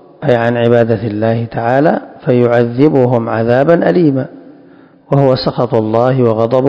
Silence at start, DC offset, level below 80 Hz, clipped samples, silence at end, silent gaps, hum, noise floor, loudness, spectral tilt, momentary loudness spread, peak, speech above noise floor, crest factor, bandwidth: 0.2 s; under 0.1%; -48 dBFS; 1%; 0 s; none; none; -41 dBFS; -12 LUFS; -9.5 dB/octave; 5 LU; 0 dBFS; 30 dB; 12 dB; 8 kHz